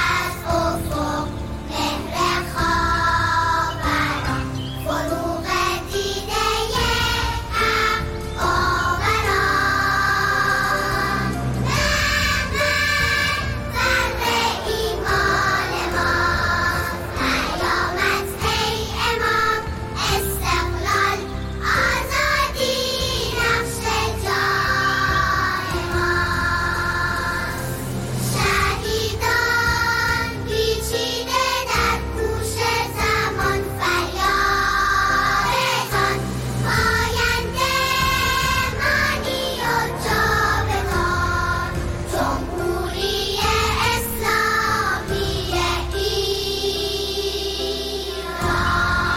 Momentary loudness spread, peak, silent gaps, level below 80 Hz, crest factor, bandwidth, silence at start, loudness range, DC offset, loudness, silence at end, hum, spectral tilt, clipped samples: 6 LU; -8 dBFS; none; -32 dBFS; 12 dB; 16.5 kHz; 0 s; 2 LU; under 0.1%; -20 LUFS; 0 s; none; -3.5 dB/octave; under 0.1%